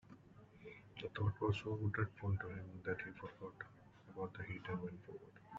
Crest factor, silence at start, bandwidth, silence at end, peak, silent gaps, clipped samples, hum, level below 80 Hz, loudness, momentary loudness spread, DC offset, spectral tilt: 20 dB; 0.05 s; 7.6 kHz; 0 s; -24 dBFS; none; under 0.1%; none; -70 dBFS; -44 LUFS; 18 LU; under 0.1%; -6 dB/octave